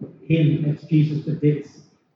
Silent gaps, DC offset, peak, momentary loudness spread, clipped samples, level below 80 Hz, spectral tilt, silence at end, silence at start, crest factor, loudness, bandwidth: none; under 0.1%; -6 dBFS; 4 LU; under 0.1%; -60 dBFS; -9.5 dB/octave; 0.5 s; 0 s; 16 dB; -21 LUFS; 6 kHz